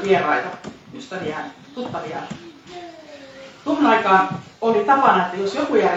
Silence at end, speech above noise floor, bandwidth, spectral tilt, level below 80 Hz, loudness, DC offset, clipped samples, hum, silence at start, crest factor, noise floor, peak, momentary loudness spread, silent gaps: 0 s; 21 dB; 8 kHz; -5.5 dB/octave; -62 dBFS; -19 LUFS; under 0.1%; under 0.1%; none; 0 s; 18 dB; -40 dBFS; -2 dBFS; 23 LU; none